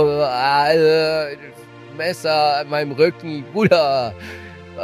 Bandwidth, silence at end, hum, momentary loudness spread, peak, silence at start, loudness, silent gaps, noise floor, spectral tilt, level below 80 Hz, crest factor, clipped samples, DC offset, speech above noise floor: 15 kHz; 0 s; none; 19 LU; -2 dBFS; 0 s; -18 LUFS; none; -39 dBFS; -5.5 dB/octave; -54 dBFS; 16 dB; under 0.1%; under 0.1%; 21 dB